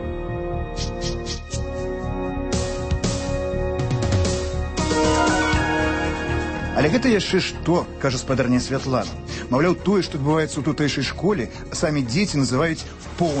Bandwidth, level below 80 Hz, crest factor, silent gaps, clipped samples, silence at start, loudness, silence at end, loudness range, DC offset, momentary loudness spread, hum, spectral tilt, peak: 8.8 kHz; -32 dBFS; 14 dB; none; under 0.1%; 0 s; -22 LUFS; 0 s; 5 LU; under 0.1%; 9 LU; none; -5 dB/octave; -8 dBFS